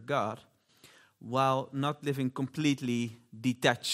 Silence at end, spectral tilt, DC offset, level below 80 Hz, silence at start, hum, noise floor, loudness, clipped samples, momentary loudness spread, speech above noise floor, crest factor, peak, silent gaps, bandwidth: 0 s; -5 dB/octave; under 0.1%; -74 dBFS; 0 s; none; -60 dBFS; -31 LUFS; under 0.1%; 9 LU; 29 dB; 24 dB; -8 dBFS; none; 16 kHz